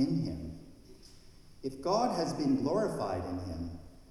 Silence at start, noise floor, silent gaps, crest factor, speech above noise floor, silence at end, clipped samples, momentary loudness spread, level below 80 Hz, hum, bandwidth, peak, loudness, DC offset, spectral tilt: 0 s; -54 dBFS; none; 16 dB; 22 dB; 0.05 s; under 0.1%; 14 LU; -54 dBFS; none; 12.5 kHz; -18 dBFS; -34 LUFS; under 0.1%; -6.5 dB/octave